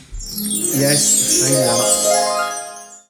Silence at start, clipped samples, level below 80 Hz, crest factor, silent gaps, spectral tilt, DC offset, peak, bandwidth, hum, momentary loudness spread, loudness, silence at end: 0 s; under 0.1%; -42 dBFS; 14 dB; none; -2.5 dB/octave; under 0.1%; -2 dBFS; 17 kHz; none; 14 LU; -14 LUFS; 0.1 s